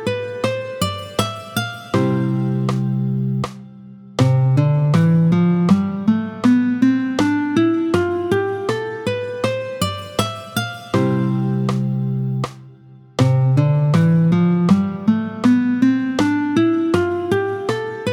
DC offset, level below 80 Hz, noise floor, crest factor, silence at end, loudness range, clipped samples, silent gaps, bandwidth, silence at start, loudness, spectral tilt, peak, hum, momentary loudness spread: under 0.1%; -52 dBFS; -43 dBFS; 16 dB; 0 s; 5 LU; under 0.1%; none; 18.5 kHz; 0 s; -18 LUFS; -7 dB/octave; -2 dBFS; none; 8 LU